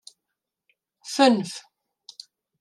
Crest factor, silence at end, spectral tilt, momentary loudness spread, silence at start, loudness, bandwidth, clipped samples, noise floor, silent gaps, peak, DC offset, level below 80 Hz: 22 dB; 1 s; -4 dB/octave; 25 LU; 1.05 s; -22 LUFS; 13 kHz; under 0.1%; -84 dBFS; none; -6 dBFS; under 0.1%; -80 dBFS